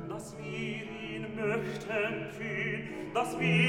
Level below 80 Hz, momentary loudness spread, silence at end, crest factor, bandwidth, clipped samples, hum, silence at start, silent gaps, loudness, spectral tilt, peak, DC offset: -64 dBFS; 8 LU; 0 s; 18 dB; 15 kHz; under 0.1%; none; 0 s; none; -34 LUFS; -5.5 dB/octave; -16 dBFS; under 0.1%